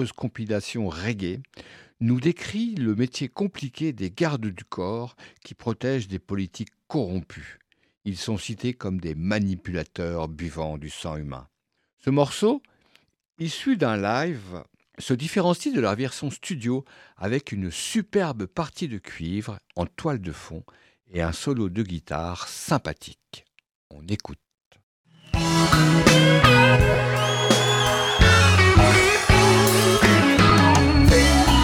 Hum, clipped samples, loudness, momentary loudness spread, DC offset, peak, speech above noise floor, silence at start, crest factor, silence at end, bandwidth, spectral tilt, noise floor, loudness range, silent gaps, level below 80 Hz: none; under 0.1%; -22 LUFS; 18 LU; under 0.1%; -4 dBFS; 38 dB; 0 s; 18 dB; 0 s; 17.5 kHz; -5 dB/octave; -63 dBFS; 14 LU; 7.97-8.01 s, 11.93-11.97 s, 23.75-23.90 s, 24.66-24.71 s, 24.83-25.04 s; -34 dBFS